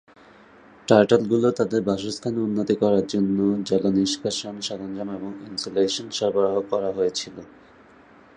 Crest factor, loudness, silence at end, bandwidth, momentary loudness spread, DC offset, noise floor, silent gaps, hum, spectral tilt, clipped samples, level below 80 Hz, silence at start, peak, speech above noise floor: 22 dB; -23 LUFS; 0.9 s; 10 kHz; 12 LU; under 0.1%; -51 dBFS; none; none; -5 dB/octave; under 0.1%; -60 dBFS; 0.9 s; -2 dBFS; 28 dB